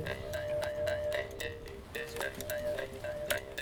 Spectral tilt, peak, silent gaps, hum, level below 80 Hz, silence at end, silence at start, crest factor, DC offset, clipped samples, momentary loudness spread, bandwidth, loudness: -3.5 dB/octave; -16 dBFS; none; none; -54 dBFS; 0 s; 0 s; 22 dB; under 0.1%; under 0.1%; 6 LU; over 20 kHz; -37 LUFS